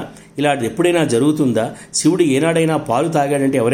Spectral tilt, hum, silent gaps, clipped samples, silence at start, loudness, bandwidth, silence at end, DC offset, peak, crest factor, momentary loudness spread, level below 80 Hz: -5 dB/octave; none; none; under 0.1%; 0 s; -16 LUFS; 16.5 kHz; 0 s; under 0.1%; -2 dBFS; 14 dB; 5 LU; -54 dBFS